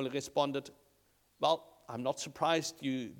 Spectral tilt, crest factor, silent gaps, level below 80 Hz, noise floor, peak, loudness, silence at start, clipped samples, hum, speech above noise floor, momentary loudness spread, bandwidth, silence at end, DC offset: -4 dB/octave; 22 dB; none; -76 dBFS; -71 dBFS; -14 dBFS; -35 LUFS; 0 s; under 0.1%; none; 37 dB; 9 LU; 19 kHz; 0 s; under 0.1%